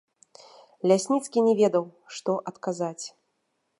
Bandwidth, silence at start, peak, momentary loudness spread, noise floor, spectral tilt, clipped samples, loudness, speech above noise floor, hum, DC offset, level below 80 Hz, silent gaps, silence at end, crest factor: 11.5 kHz; 0.85 s; -6 dBFS; 15 LU; -76 dBFS; -5.5 dB/octave; under 0.1%; -25 LUFS; 51 dB; none; under 0.1%; -80 dBFS; none; 0.7 s; 20 dB